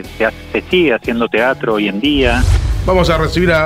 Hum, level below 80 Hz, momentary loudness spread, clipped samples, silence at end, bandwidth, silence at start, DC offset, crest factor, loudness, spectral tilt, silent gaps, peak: none; -22 dBFS; 4 LU; under 0.1%; 0 s; 15.5 kHz; 0 s; under 0.1%; 14 dB; -14 LUFS; -6 dB/octave; none; 0 dBFS